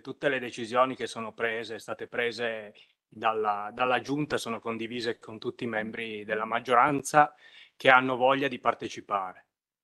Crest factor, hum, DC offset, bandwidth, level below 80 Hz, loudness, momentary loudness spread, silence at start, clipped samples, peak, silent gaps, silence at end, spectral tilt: 26 dB; none; under 0.1%; 12.5 kHz; -72 dBFS; -28 LUFS; 13 LU; 0.05 s; under 0.1%; -2 dBFS; none; 0.5 s; -4 dB/octave